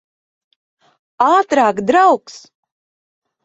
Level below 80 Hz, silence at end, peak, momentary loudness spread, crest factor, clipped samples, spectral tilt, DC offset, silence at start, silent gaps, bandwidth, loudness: -62 dBFS; 1.05 s; -2 dBFS; 5 LU; 16 dB; under 0.1%; -4.5 dB/octave; under 0.1%; 1.2 s; none; 8 kHz; -14 LUFS